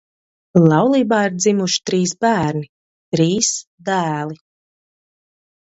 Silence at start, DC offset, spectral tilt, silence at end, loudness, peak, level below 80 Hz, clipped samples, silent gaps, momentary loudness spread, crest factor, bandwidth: 0.55 s; under 0.1%; -4.5 dB/octave; 1.3 s; -17 LUFS; 0 dBFS; -56 dBFS; under 0.1%; 2.69-3.12 s, 3.67-3.78 s; 12 LU; 18 dB; 8.2 kHz